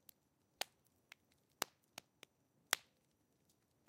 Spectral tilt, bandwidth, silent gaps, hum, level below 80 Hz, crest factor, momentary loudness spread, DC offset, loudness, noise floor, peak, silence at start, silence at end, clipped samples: 1 dB/octave; 16 kHz; none; none; under -90 dBFS; 40 dB; 24 LU; under 0.1%; -45 LUFS; -80 dBFS; -12 dBFS; 1.6 s; 1.1 s; under 0.1%